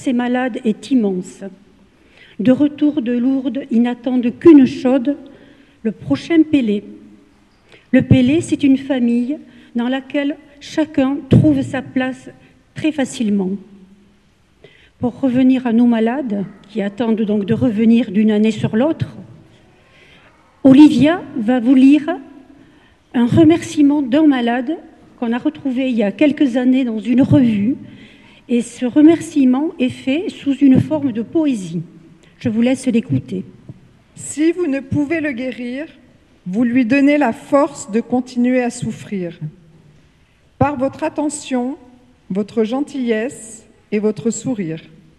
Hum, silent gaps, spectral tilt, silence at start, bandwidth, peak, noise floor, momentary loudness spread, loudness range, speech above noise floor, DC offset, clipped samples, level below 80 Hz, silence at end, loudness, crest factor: none; none; -6.5 dB/octave; 0 s; 11.5 kHz; 0 dBFS; -54 dBFS; 14 LU; 7 LU; 39 dB; under 0.1%; under 0.1%; -50 dBFS; 0.4 s; -16 LUFS; 16 dB